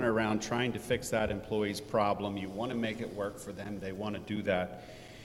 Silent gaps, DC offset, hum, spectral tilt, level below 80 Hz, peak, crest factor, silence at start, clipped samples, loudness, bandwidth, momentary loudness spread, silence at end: none; under 0.1%; none; -5 dB/octave; -56 dBFS; -16 dBFS; 18 dB; 0 s; under 0.1%; -34 LUFS; 16.5 kHz; 9 LU; 0 s